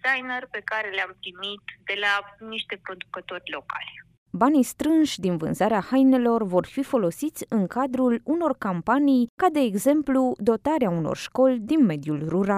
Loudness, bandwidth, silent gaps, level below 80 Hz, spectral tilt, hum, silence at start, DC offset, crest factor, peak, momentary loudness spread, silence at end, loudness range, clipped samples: -24 LUFS; 15.5 kHz; 4.18-4.26 s, 9.29-9.38 s; -60 dBFS; -5.5 dB/octave; none; 0.05 s; under 0.1%; 16 dB; -8 dBFS; 13 LU; 0 s; 7 LU; under 0.1%